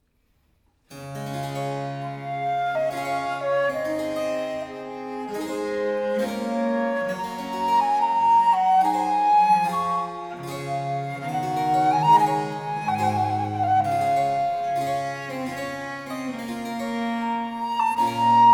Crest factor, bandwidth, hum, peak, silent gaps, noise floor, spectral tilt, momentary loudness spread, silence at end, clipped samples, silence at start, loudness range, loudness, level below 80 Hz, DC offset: 16 dB; 18.5 kHz; none; -6 dBFS; none; -66 dBFS; -5.5 dB/octave; 13 LU; 0 s; under 0.1%; 0.9 s; 7 LU; -24 LUFS; -62 dBFS; under 0.1%